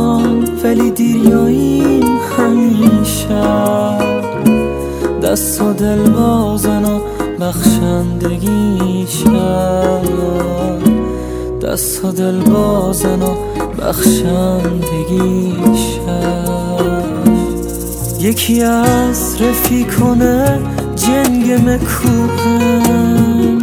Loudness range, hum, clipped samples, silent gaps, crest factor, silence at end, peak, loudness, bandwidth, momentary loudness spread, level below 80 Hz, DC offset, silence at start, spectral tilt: 3 LU; none; under 0.1%; none; 12 dB; 0 s; 0 dBFS; -13 LUFS; 16 kHz; 6 LU; -28 dBFS; under 0.1%; 0 s; -5.5 dB/octave